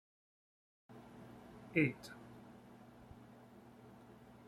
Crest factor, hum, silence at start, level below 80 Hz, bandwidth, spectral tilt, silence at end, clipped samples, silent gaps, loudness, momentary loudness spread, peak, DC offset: 28 dB; none; 0.9 s; -74 dBFS; 15.5 kHz; -7 dB/octave; 0 s; under 0.1%; none; -38 LUFS; 24 LU; -18 dBFS; under 0.1%